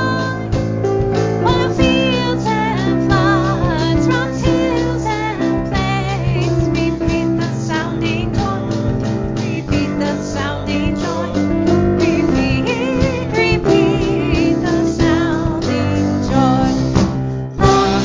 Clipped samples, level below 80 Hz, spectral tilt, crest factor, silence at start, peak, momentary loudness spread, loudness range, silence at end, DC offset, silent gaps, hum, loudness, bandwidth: under 0.1%; -28 dBFS; -6.5 dB/octave; 16 dB; 0 s; 0 dBFS; 6 LU; 3 LU; 0 s; under 0.1%; none; none; -16 LUFS; 7.6 kHz